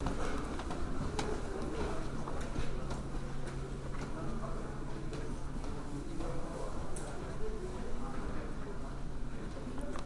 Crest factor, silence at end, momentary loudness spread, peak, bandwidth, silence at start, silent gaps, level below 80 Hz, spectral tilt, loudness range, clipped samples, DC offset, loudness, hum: 16 dB; 0 s; 5 LU; -22 dBFS; 11.5 kHz; 0 s; none; -42 dBFS; -6 dB/octave; 3 LU; under 0.1%; under 0.1%; -42 LUFS; none